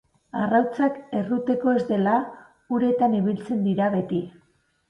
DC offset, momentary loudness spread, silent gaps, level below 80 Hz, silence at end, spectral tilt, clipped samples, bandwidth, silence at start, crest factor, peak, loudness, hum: under 0.1%; 8 LU; none; -64 dBFS; 0.6 s; -9 dB/octave; under 0.1%; 6.6 kHz; 0.35 s; 16 dB; -8 dBFS; -23 LUFS; none